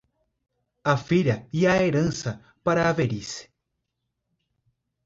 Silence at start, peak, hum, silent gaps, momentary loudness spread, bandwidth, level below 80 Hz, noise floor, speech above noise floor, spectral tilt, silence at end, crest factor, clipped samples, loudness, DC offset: 0.85 s; -8 dBFS; none; none; 12 LU; 7.8 kHz; -54 dBFS; -80 dBFS; 57 dB; -6 dB/octave; 1.65 s; 20 dB; under 0.1%; -24 LUFS; under 0.1%